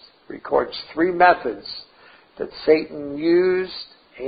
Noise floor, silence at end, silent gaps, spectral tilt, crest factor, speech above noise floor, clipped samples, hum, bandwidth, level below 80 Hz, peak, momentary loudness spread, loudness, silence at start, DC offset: -51 dBFS; 0 s; none; -9.5 dB/octave; 20 dB; 31 dB; under 0.1%; none; 5 kHz; -56 dBFS; -2 dBFS; 19 LU; -20 LUFS; 0.3 s; under 0.1%